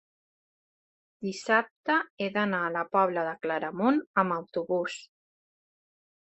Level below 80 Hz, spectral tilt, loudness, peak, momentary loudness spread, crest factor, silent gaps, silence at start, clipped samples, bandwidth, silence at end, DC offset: -76 dBFS; -5.5 dB/octave; -28 LUFS; -10 dBFS; 9 LU; 22 dB; 1.71-1.84 s, 2.10-2.17 s, 4.06-4.14 s; 1.2 s; under 0.1%; 8.6 kHz; 1.25 s; under 0.1%